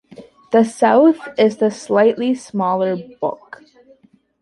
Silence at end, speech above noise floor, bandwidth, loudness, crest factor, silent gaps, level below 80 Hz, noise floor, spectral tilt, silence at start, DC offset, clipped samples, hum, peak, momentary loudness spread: 1.05 s; 37 dB; 11.5 kHz; -17 LUFS; 16 dB; none; -64 dBFS; -53 dBFS; -6 dB/octave; 0.2 s; under 0.1%; under 0.1%; none; -2 dBFS; 12 LU